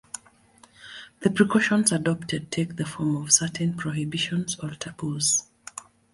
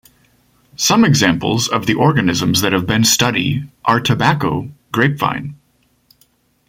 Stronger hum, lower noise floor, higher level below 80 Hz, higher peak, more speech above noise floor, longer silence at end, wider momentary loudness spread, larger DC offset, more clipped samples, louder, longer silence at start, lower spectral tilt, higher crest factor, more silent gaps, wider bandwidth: neither; about the same, -56 dBFS vs -59 dBFS; second, -60 dBFS vs -46 dBFS; second, -4 dBFS vs 0 dBFS; second, 31 dB vs 44 dB; second, 0.3 s vs 1.15 s; first, 20 LU vs 9 LU; neither; neither; second, -24 LUFS vs -15 LUFS; second, 0.15 s vs 0.8 s; about the same, -3.5 dB/octave vs -4 dB/octave; first, 24 dB vs 16 dB; neither; second, 12 kHz vs 16.5 kHz